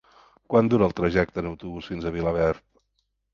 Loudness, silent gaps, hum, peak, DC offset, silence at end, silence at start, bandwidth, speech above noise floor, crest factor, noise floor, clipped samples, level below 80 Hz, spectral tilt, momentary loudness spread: -24 LUFS; none; none; -6 dBFS; under 0.1%; 0.75 s; 0.5 s; 7.2 kHz; 51 dB; 20 dB; -75 dBFS; under 0.1%; -44 dBFS; -8 dB/octave; 13 LU